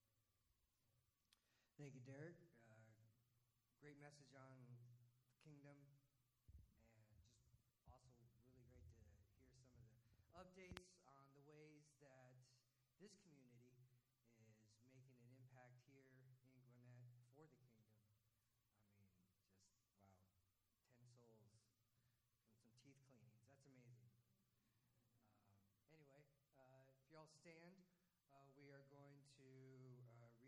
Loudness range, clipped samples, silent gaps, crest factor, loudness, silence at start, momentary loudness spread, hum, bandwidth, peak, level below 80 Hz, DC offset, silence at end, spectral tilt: 3 LU; under 0.1%; none; 38 dB; -66 LUFS; 0 s; 8 LU; none; 9.6 kHz; -32 dBFS; -86 dBFS; under 0.1%; 0 s; -5.5 dB/octave